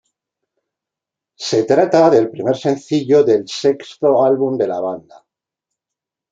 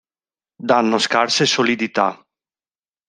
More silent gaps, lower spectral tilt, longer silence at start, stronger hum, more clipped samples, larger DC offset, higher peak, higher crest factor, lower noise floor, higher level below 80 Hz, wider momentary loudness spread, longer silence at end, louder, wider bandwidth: neither; first, -6 dB/octave vs -3 dB/octave; first, 1.4 s vs 0.6 s; neither; neither; neither; about the same, 0 dBFS vs 0 dBFS; about the same, 16 dB vs 20 dB; second, -85 dBFS vs under -90 dBFS; about the same, -64 dBFS vs -66 dBFS; first, 9 LU vs 6 LU; first, 1.3 s vs 0.95 s; about the same, -15 LUFS vs -17 LUFS; second, 7.8 kHz vs 10.5 kHz